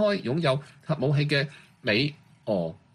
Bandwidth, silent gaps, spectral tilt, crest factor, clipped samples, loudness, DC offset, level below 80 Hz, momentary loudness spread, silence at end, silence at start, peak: 11 kHz; none; -7 dB/octave; 16 dB; under 0.1%; -27 LUFS; under 0.1%; -62 dBFS; 9 LU; 0.2 s; 0 s; -10 dBFS